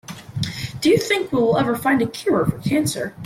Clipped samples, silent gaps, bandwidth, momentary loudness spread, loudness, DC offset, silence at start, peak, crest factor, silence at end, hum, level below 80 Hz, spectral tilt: under 0.1%; none; 16.5 kHz; 9 LU; -20 LUFS; under 0.1%; 0.1 s; -6 dBFS; 14 dB; 0 s; none; -50 dBFS; -5 dB/octave